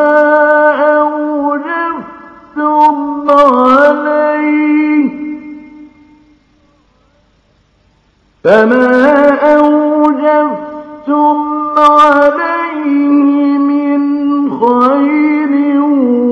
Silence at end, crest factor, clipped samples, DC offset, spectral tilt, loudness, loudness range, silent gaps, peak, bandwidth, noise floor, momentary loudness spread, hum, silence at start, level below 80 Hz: 0 s; 10 dB; 0.8%; under 0.1%; -6.5 dB/octave; -10 LUFS; 6 LU; none; 0 dBFS; 6.6 kHz; -52 dBFS; 9 LU; none; 0 s; -52 dBFS